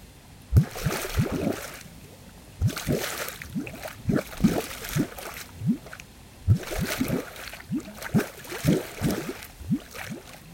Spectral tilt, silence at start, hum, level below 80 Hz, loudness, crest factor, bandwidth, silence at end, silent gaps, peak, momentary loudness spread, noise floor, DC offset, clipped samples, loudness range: -5.5 dB/octave; 0 s; none; -42 dBFS; -29 LUFS; 22 dB; 17 kHz; 0 s; none; -6 dBFS; 17 LU; -48 dBFS; under 0.1%; under 0.1%; 2 LU